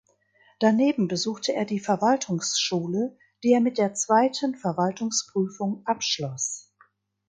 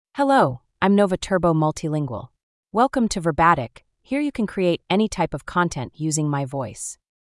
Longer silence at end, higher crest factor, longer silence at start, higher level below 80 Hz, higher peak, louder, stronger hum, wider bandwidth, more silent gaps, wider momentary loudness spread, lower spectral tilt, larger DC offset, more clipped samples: first, 0.7 s vs 0.4 s; about the same, 18 dB vs 18 dB; first, 0.6 s vs 0.15 s; second, -72 dBFS vs -46 dBFS; second, -8 dBFS vs -4 dBFS; second, -25 LUFS vs -22 LUFS; neither; second, 9.6 kHz vs 12 kHz; second, none vs 2.43-2.63 s; second, 8 LU vs 11 LU; second, -4 dB/octave vs -5.5 dB/octave; neither; neither